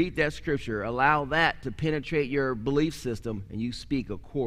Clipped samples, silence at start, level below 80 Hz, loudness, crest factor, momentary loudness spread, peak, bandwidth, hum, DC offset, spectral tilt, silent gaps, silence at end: under 0.1%; 0 s; -46 dBFS; -28 LUFS; 18 dB; 10 LU; -8 dBFS; 15.5 kHz; none; under 0.1%; -6 dB/octave; none; 0 s